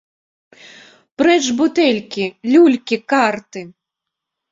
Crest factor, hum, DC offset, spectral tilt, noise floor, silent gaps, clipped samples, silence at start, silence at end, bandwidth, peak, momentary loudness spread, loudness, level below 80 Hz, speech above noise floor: 16 dB; none; under 0.1%; -4 dB/octave; -82 dBFS; none; under 0.1%; 1.2 s; 0.8 s; 7.8 kHz; -2 dBFS; 13 LU; -15 LUFS; -64 dBFS; 66 dB